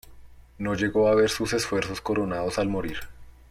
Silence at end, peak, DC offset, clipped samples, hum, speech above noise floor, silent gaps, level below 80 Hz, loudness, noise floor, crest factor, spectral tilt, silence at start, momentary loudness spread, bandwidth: 0.2 s; -10 dBFS; under 0.1%; under 0.1%; none; 22 dB; none; -48 dBFS; -25 LUFS; -47 dBFS; 16 dB; -5 dB/octave; 0.1 s; 11 LU; 16 kHz